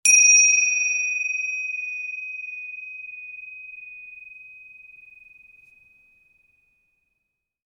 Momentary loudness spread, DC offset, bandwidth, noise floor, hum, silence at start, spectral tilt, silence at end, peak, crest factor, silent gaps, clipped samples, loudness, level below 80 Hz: 27 LU; under 0.1%; 19 kHz; -79 dBFS; none; 0.05 s; 8.5 dB/octave; 3.05 s; -4 dBFS; 20 dB; none; under 0.1%; -18 LUFS; -78 dBFS